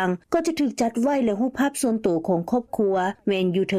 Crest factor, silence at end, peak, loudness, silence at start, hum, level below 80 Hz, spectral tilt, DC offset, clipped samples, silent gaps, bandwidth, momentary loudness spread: 14 dB; 0 s; -10 dBFS; -23 LUFS; 0 s; none; -58 dBFS; -5.5 dB/octave; under 0.1%; under 0.1%; none; 15.5 kHz; 2 LU